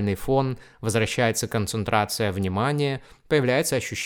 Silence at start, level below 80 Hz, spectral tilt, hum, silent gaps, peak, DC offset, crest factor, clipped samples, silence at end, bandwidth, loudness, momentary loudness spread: 0 s; -50 dBFS; -5 dB/octave; none; none; -4 dBFS; under 0.1%; 20 dB; under 0.1%; 0 s; 18 kHz; -24 LUFS; 5 LU